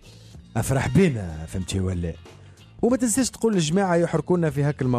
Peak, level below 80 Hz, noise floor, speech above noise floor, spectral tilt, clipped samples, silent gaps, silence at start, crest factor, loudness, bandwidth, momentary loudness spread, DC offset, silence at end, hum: -8 dBFS; -44 dBFS; -45 dBFS; 23 dB; -5.5 dB/octave; under 0.1%; none; 0.05 s; 16 dB; -23 LUFS; 14 kHz; 11 LU; under 0.1%; 0 s; none